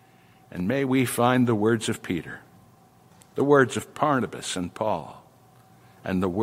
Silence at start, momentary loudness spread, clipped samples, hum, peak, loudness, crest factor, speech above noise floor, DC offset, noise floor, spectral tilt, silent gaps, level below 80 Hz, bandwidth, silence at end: 0.5 s; 18 LU; under 0.1%; none; -6 dBFS; -24 LUFS; 20 dB; 31 dB; under 0.1%; -55 dBFS; -5.5 dB/octave; none; -64 dBFS; 16 kHz; 0 s